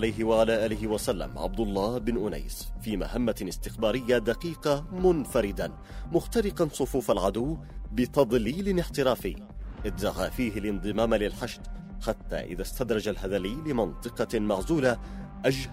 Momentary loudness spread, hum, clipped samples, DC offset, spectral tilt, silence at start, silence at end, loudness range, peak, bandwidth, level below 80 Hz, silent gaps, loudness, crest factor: 11 LU; none; under 0.1%; under 0.1%; -5.5 dB/octave; 0 s; 0 s; 3 LU; -8 dBFS; 16 kHz; -40 dBFS; none; -29 LUFS; 20 dB